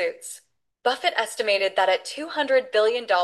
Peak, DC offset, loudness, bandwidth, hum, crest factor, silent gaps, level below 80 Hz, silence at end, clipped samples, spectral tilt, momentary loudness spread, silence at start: -8 dBFS; under 0.1%; -23 LUFS; 12.5 kHz; none; 16 dB; none; -78 dBFS; 0 s; under 0.1%; -0.5 dB/octave; 11 LU; 0 s